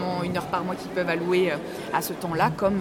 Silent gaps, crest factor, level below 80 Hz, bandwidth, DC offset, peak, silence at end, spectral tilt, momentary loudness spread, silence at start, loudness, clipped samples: none; 18 dB; -54 dBFS; 17.5 kHz; under 0.1%; -8 dBFS; 0 s; -5.5 dB/octave; 6 LU; 0 s; -26 LUFS; under 0.1%